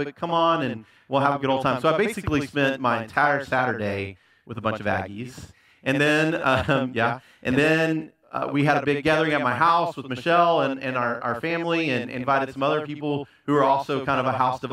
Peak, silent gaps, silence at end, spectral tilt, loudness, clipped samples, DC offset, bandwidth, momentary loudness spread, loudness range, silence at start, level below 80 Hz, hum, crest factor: -4 dBFS; none; 0 s; -6 dB/octave; -23 LUFS; under 0.1%; under 0.1%; 14.5 kHz; 10 LU; 3 LU; 0 s; -56 dBFS; none; 18 dB